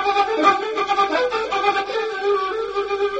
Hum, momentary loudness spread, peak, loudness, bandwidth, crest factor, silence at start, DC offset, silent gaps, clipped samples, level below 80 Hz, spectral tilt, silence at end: none; 7 LU; -2 dBFS; -20 LUFS; 8.4 kHz; 18 dB; 0 s; under 0.1%; none; under 0.1%; -56 dBFS; -3 dB/octave; 0 s